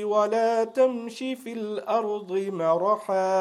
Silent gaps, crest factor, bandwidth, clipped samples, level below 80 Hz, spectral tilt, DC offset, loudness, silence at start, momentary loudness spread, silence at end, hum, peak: none; 14 dB; 13.5 kHz; under 0.1%; -84 dBFS; -5.5 dB/octave; under 0.1%; -26 LUFS; 0 s; 10 LU; 0 s; none; -10 dBFS